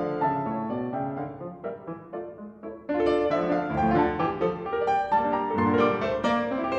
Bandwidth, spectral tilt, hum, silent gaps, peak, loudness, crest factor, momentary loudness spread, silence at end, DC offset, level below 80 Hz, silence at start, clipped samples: 8.4 kHz; -7.5 dB/octave; none; none; -10 dBFS; -26 LUFS; 16 dB; 14 LU; 0 s; under 0.1%; -52 dBFS; 0 s; under 0.1%